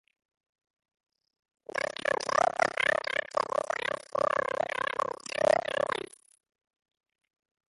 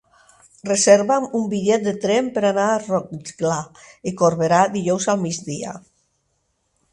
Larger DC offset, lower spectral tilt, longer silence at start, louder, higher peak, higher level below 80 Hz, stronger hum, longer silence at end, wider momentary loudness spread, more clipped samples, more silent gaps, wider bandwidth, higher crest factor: neither; second, -2.5 dB/octave vs -4.5 dB/octave; first, 1.75 s vs 0.65 s; second, -30 LUFS vs -19 LUFS; second, -10 dBFS vs 0 dBFS; second, -70 dBFS vs -60 dBFS; neither; first, 1.65 s vs 1.15 s; second, 8 LU vs 16 LU; neither; neither; about the same, 11.5 kHz vs 11.5 kHz; about the same, 22 dB vs 20 dB